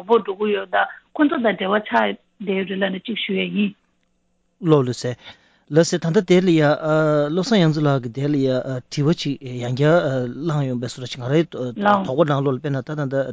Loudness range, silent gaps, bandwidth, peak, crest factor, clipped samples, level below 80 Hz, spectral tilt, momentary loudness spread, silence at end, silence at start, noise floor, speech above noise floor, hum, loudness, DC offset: 5 LU; none; 8 kHz; -4 dBFS; 16 dB; under 0.1%; -60 dBFS; -6.5 dB/octave; 9 LU; 0 s; 0 s; -66 dBFS; 47 dB; none; -20 LUFS; under 0.1%